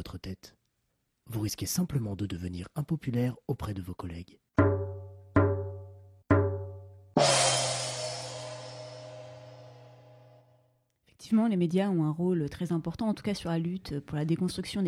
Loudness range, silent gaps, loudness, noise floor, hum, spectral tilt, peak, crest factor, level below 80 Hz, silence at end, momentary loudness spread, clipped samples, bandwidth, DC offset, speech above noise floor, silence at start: 7 LU; none; -30 LUFS; -78 dBFS; none; -5 dB/octave; -12 dBFS; 20 dB; -56 dBFS; 0 s; 19 LU; under 0.1%; 15.5 kHz; under 0.1%; 47 dB; 0 s